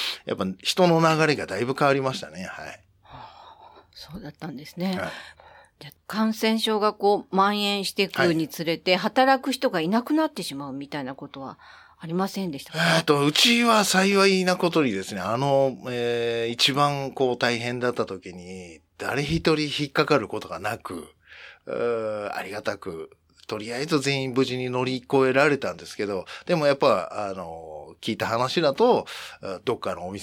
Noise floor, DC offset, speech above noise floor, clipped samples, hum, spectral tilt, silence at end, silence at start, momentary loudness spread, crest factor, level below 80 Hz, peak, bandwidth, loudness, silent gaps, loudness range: -50 dBFS; under 0.1%; 25 dB; under 0.1%; none; -4.5 dB/octave; 0 s; 0 s; 18 LU; 20 dB; -58 dBFS; -6 dBFS; 18.5 kHz; -24 LUFS; none; 9 LU